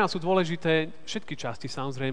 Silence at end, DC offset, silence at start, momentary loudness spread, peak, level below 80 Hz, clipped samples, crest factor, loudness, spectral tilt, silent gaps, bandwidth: 0 s; 1%; 0 s; 10 LU; -10 dBFS; -64 dBFS; under 0.1%; 18 dB; -28 LUFS; -5.5 dB/octave; none; 10 kHz